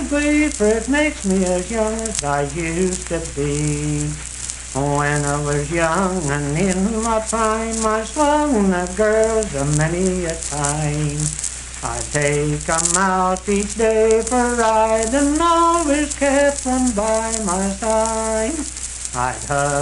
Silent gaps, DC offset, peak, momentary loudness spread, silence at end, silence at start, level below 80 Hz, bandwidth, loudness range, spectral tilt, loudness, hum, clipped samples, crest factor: none; under 0.1%; 0 dBFS; 7 LU; 0 s; 0 s; -34 dBFS; 11.5 kHz; 4 LU; -4.5 dB/octave; -19 LUFS; none; under 0.1%; 18 dB